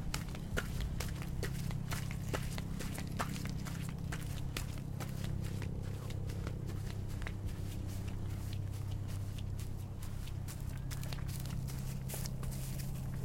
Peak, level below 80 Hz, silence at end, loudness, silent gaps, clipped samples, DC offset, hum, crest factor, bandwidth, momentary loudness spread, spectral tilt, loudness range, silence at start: -18 dBFS; -46 dBFS; 0 s; -41 LUFS; none; under 0.1%; under 0.1%; none; 22 dB; 16.5 kHz; 3 LU; -5.5 dB/octave; 2 LU; 0 s